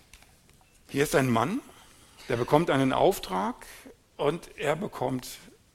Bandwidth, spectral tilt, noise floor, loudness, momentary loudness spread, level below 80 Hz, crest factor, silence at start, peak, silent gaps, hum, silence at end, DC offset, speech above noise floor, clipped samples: 16.5 kHz; -5.5 dB/octave; -59 dBFS; -28 LUFS; 19 LU; -54 dBFS; 24 dB; 0.15 s; -6 dBFS; none; none; 0.35 s; under 0.1%; 32 dB; under 0.1%